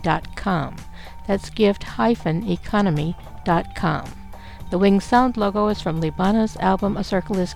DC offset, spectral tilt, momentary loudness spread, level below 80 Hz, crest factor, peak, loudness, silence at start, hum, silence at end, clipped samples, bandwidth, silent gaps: 1%; -7 dB/octave; 14 LU; -38 dBFS; 18 dB; -4 dBFS; -21 LUFS; 0 s; none; 0 s; under 0.1%; 13 kHz; none